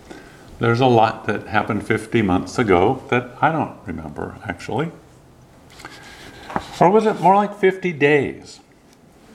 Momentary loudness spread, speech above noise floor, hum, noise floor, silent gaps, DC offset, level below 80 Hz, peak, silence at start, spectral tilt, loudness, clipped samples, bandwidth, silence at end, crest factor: 22 LU; 32 dB; none; -50 dBFS; none; under 0.1%; -50 dBFS; 0 dBFS; 0.1 s; -6.5 dB/octave; -19 LUFS; under 0.1%; 13.5 kHz; 0.8 s; 20 dB